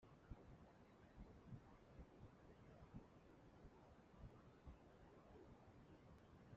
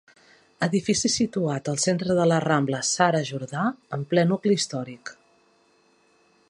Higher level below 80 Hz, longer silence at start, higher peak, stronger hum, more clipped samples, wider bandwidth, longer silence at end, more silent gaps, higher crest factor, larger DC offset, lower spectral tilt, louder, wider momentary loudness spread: second, -72 dBFS vs -62 dBFS; second, 0 s vs 0.6 s; second, -46 dBFS vs -4 dBFS; neither; neither; second, 7.2 kHz vs 11.5 kHz; second, 0 s vs 1.4 s; neither; about the same, 20 dB vs 20 dB; neither; first, -7 dB/octave vs -4.5 dB/octave; second, -66 LUFS vs -24 LUFS; second, 5 LU vs 10 LU